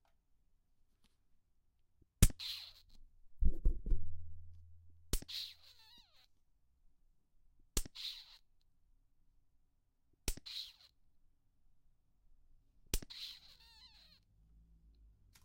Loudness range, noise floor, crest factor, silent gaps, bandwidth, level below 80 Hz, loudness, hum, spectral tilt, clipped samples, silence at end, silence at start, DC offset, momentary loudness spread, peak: 10 LU; -75 dBFS; 30 dB; none; 16 kHz; -44 dBFS; -42 LUFS; none; -3.5 dB/octave; under 0.1%; 2.1 s; 2.2 s; under 0.1%; 25 LU; -10 dBFS